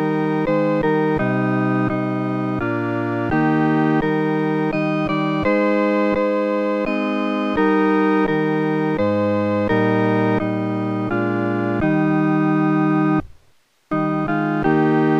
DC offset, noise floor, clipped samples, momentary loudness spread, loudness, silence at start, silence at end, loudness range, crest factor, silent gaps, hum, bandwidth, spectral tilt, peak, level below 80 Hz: under 0.1%; -57 dBFS; under 0.1%; 5 LU; -19 LUFS; 0 s; 0 s; 1 LU; 12 dB; none; none; 6.6 kHz; -9 dB/octave; -6 dBFS; -46 dBFS